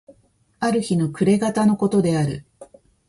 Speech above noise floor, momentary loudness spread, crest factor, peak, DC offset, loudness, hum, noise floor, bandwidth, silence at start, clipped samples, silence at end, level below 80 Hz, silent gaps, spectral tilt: 40 dB; 8 LU; 14 dB; -6 dBFS; under 0.1%; -20 LUFS; none; -59 dBFS; 11.5 kHz; 0.6 s; under 0.1%; 0.45 s; -54 dBFS; none; -7 dB/octave